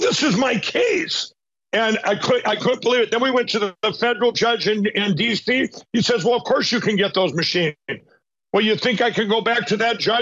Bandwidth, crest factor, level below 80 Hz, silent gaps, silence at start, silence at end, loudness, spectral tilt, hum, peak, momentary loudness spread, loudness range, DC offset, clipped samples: 8 kHz; 12 dB; -64 dBFS; none; 0 s; 0 s; -19 LUFS; -4 dB/octave; none; -8 dBFS; 5 LU; 1 LU; under 0.1%; under 0.1%